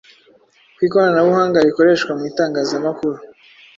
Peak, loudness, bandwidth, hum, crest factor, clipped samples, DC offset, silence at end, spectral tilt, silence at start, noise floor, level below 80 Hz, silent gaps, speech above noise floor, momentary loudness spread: -2 dBFS; -16 LUFS; 7.8 kHz; none; 16 dB; under 0.1%; under 0.1%; 0.5 s; -6 dB/octave; 0.8 s; -52 dBFS; -60 dBFS; none; 37 dB; 9 LU